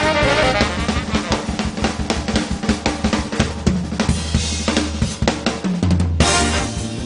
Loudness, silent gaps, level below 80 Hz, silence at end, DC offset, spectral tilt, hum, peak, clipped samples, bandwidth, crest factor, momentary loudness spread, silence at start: -19 LUFS; none; -28 dBFS; 0 s; under 0.1%; -4.5 dB/octave; none; -2 dBFS; under 0.1%; 11 kHz; 18 dB; 6 LU; 0 s